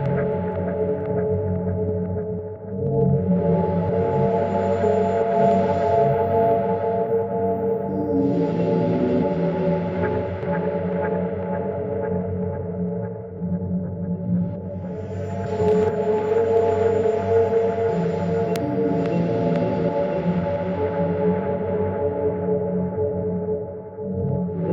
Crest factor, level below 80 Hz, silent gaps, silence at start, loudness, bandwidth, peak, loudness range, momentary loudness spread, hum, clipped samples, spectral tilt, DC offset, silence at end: 16 dB; -50 dBFS; none; 0 s; -22 LUFS; 7.6 kHz; -6 dBFS; 6 LU; 8 LU; none; under 0.1%; -9.5 dB/octave; under 0.1%; 0 s